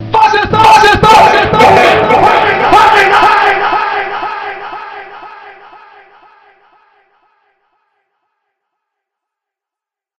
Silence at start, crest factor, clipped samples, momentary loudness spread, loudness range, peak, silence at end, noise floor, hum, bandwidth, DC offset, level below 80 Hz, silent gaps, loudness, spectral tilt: 0 s; 10 dB; 2%; 19 LU; 20 LU; 0 dBFS; 4.65 s; -86 dBFS; none; 16 kHz; under 0.1%; -36 dBFS; none; -7 LUFS; -4 dB/octave